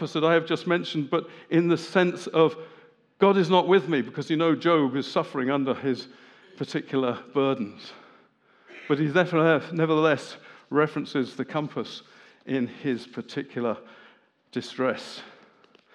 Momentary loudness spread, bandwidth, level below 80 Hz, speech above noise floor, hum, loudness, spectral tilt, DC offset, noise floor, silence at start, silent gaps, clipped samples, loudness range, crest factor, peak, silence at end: 15 LU; 10.5 kHz; -86 dBFS; 35 dB; none; -25 LUFS; -6.5 dB/octave; under 0.1%; -60 dBFS; 0 s; none; under 0.1%; 8 LU; 22 dB; -4 dBFS; 0.65 s